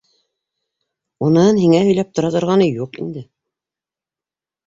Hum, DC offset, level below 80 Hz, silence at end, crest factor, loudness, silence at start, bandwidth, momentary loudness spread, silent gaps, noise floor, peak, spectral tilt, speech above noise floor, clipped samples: none; under 0.1%; -56 dBFS; 1.45 s; 16 dB; -15 LUFS; 1.2 s; 7.8 kHz; 15 LU; none; -89 dBFS; -2 dBFS; -7 dB/octave; 75 dB; under 0.1%